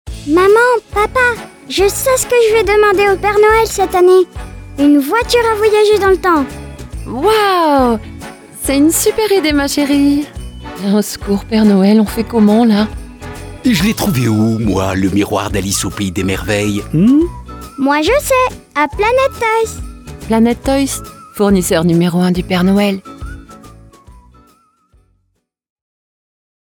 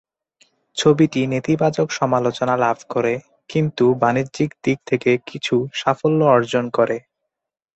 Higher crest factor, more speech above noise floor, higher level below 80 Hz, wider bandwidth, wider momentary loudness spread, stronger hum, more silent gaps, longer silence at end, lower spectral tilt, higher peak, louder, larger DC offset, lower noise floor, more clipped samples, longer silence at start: second, 12 dB vs 18 dB; second, 54 dB vs 63 dB; first, -32 dBFS vs -58 dBFS; first, over 20 kHz vs 8.2 kHz; first, 16 LU vs 7 LU; neither; neither; first, 2.7 s vs 0.75 s; about the same, -5 dB/octave vs -6 dB/octave; about the same, 0 dBFS vs -2 dBFS; first, -12 LUFS vs -19 LUFS; neither; second, -66 dBFS vs -81 dBFS; neither; second, 0.05 s vs 0.75 s